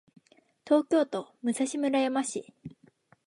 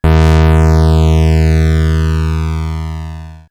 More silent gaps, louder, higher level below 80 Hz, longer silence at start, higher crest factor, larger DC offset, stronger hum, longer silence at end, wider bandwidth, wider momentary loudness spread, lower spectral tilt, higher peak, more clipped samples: neither; second, -28 LUFS vs -11 LUFS; second, -76 dBFS vs -14 dBFS; first, 0.65 s vs 0.05 s; first, 18 dB vs 10 dB; neither; neither; first, 0.55 s vs 0.1 s; first, 11.5 kHz vs 10 kHz; first, 21 LU vs 14 LU; second, -4 dB/octave vs -7.5 dB/octave; second, -10 dBFS vs 0 dBFS; neither